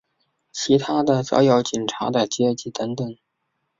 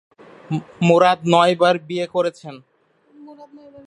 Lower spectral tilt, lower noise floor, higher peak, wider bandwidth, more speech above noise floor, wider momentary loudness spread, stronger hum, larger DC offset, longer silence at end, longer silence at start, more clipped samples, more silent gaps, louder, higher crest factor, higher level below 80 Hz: about the same, -5 dB/octave vs -6 dB/octave; first, -75 dBFS vs -54 dBFS; second, -4 dBFS vs 0 dBFS; second, 7.8 kHz vs 11 kHz; first, 55 dB vs 36 dB; about the same, 12 LU vs 14 LU; neither; neither; first, 0.65 s vs 0.05 s; about the same, 0.55 s vs 0.5 s; neither; neither; second, -21 LUFS vs -18 LUFS; about the same, 18 dB vs 20 dB; about the same, -62 dBFS vs -64 dBFS